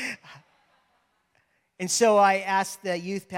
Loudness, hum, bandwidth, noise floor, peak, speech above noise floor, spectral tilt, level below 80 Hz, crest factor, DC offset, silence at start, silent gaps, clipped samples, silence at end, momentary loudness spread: -24 LUFS; none; 16.5 kHz; -70 dBFS; -8 dBFS; 46 dB; -3 dB/octave; -78 dBFS; 18 dB; under 0.1%; 0 s; none; under 0.1%; 0 s; 16 LU